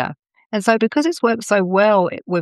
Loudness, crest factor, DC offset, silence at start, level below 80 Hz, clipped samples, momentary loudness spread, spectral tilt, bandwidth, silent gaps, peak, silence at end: -17 LUFS; 16 dB; under 0.1%; 0 s; -68 dBFS; under 0.1%; 7 LU; -5.5 dB/octave; 12.5 kHz; 0.46-0.50 s; -2 dBFS; 0 s